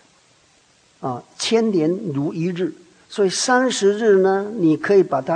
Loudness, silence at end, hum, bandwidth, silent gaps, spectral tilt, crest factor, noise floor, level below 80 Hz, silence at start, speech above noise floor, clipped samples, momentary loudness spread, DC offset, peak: -19 LUFS; 0 s; none; 10 kHz; none; -4.5 dB/octave; 16 dB; -56 dBFS; -68 dBFS; 1 s; 38 dB; under 0.1%; 13 LU; under 0.1%; -4 dBFS